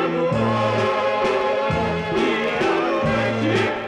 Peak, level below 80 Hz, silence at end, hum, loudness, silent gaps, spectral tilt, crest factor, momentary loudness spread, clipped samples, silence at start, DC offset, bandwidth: -10 dBFS; -46 dBFS; 0 s; none; -20 LUFS; none; -6 dB/octave; 10 dB; 1 LU; under 0.1%; 0 s; under 0.1%; 11 kHz